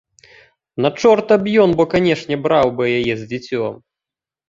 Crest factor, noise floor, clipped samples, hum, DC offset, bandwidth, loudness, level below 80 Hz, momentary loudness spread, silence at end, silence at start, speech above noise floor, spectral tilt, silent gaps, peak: 16 dB; -88 dBFS; under 0.1%; none; under 0.1%; 7.6 kHz; -16 LUFS; -50 dBFS; 11 LU; 0.75 s; 0.75 s; 72 dB; -6.5 dB/octave; none; -2 dBFS